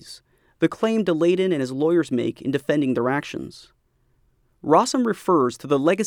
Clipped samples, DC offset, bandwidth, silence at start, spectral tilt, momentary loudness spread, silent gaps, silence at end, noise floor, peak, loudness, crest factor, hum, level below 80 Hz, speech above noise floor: under 0.1%; under 0.1%; 15.5 kHz; 0.05 s; -5.5 dB/octave; 10 LU; none; 0 s; -64 dBFS; -4 dBFS; -21 LUFS; 18 dB; none; -64 dBFS; 43 dB